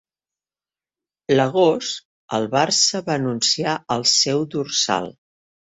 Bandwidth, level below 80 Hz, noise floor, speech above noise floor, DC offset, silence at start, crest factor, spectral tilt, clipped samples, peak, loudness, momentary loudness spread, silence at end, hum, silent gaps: 8.2 kHz; -62 dBFS; under -90 dBFS; over 70 dB; under 0.1%; 1.3 s; 20 dB; -3 dB/octave; under 0.1%; -2 dBFS; -19 LUFS; 11 LU; 0.65 s; none; 2.05-2.28 s